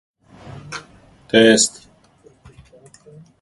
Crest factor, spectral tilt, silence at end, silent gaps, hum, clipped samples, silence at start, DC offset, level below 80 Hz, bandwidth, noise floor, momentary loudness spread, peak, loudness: 22 dB; -2.5 dB/octave; 1.7 s; none; none; under 0.1%; 0.55 s; under 0.1%; -56 dBFS; 11.5 kHz; -52 dBFS; 26 LU; 0 dBFS; -14 LUFS